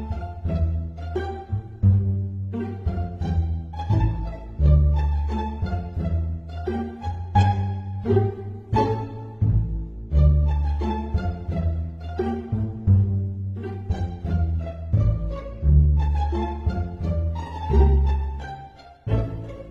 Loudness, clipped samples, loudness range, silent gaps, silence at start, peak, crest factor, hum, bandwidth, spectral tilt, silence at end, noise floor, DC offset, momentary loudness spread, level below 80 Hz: -24 LUFS; under 0.1%; 3 LU; none; 0 s; -6 dBFS; 16 dB; none; 5.6 kHz; -9.5 dB/octave; 0 s; -43 dBFS; under 0.1%; 12 LU; -26 dBFS